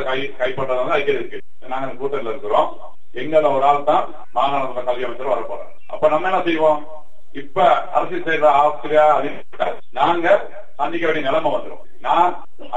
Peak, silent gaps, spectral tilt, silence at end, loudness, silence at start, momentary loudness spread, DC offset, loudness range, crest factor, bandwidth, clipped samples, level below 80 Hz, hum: -2 dBFS; none; -6 dB/octave; 0 s; -19 LUFS; 0 s; 14 LU; 7%; 3 LU; 18 dB; 9.2 kHz; under 0.1%; -60 dBFS; none